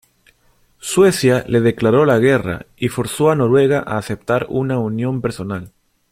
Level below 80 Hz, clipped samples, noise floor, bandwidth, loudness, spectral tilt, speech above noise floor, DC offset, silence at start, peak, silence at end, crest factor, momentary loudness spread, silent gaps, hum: -48 dBFS; under 0.1%; -57 dBFS; 16 kHz; -17 LUFS; -6 dB/octave; 41 dB; under 0.1%; 0.85 s; -2 dBFS; 0.45 s; 16 dB; 10 LU; none; none